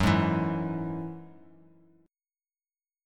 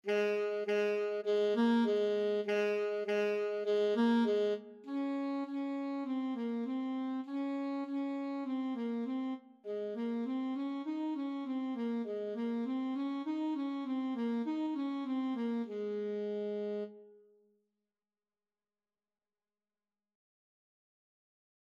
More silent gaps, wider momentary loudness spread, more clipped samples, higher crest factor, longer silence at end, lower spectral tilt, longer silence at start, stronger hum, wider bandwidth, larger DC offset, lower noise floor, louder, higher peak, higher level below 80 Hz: neither; first, 16 LU vs 8 LU; neither; first, 22 dB vs 16 dB; second, 1.75 s vs 4.55 s; about the same, -7 dB/octave vs -6.5 dB/octave; about the same, 0 s vs 0.05 s; neither; first, 13.5 kHz vs 7.6 kHz; neither; about the same, under -90 dBFS vs under -90 dBFS; first, -30 LUFS vs -36 LUFS; first, -10 dBFS vs -20 dBFS; first, -50 dBFS vs under -90 dBFS